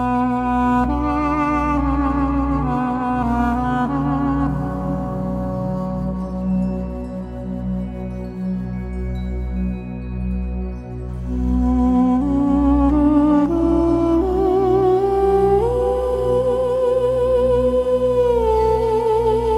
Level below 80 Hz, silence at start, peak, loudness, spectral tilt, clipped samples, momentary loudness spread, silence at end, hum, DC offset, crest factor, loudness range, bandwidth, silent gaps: -28 dBFS; 0 s; -6 dBFS; -19 LUFS; -9 dB/octave; under 0.1%; 11 LU; 0 s; none; under 0.1%; 12 dB; 10 LU; 11.5 kHz; none